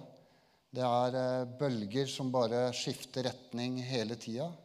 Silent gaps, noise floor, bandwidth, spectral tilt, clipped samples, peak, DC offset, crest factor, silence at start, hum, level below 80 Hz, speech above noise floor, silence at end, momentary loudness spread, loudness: none; -67 dBFS; 14.5 kHz; -5.5 dB/octave; under 0.1%; -18 dBFS; under 0.1%; 18 dB; 0 s; none; -80 dBFS; 33 dB; 0.05 s; 7 LU; -35 LUFS